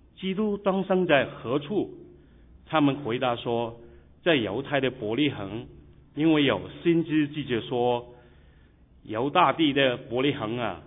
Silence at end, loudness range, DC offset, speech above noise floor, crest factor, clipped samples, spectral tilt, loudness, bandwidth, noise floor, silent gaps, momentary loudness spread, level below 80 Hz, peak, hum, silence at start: 0 s; 2 LU; under 0.1%; 30 dB; 20 dB; under 0.1%; -9.5 dB/octave; -26 LUFS; 3.9 kHz; -56 dBFS; none; 9 LU; -56 dBFS; -6 dBFS; none; 0.2 s